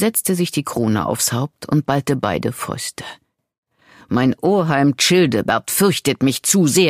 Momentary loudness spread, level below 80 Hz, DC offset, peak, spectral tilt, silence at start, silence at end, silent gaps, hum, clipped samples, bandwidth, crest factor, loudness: 10 LU; -54 dBFS; under 0.1%; -2 dBFS; -4.5 dB/octave; 0 s; 0 s; 3.58-3.63 s; none; under 0.1%; 15.5 kHz; 16 dB; -18 LUFS